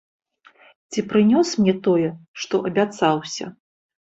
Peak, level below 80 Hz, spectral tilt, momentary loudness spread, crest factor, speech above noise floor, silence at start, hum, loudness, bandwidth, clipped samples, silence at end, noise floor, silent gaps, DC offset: -4 dBFS; -62 dBFS; -5.5 dB/octave; 14 LU; 18 dB; 33 dB; 0.9 s; none; -21 LUFS; 8 kHz; under 0.1%; 0.65 s; -53 dBFS; 2.28-2.34 s; under 0.1%